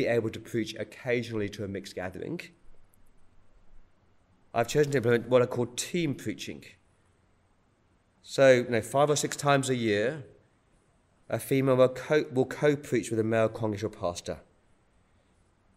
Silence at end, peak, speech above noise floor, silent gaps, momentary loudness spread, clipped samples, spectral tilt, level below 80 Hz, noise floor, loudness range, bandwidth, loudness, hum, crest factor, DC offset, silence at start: 1.35 s; -8 dBFS; 39 dB; none; 14 LU; under 0.1%; -5 dB/octave; -62 dBFS; -67 dBFS; 9 LU; 16 kHz; -28 LUFS; none; 22 dB; under 0.1%; 0 s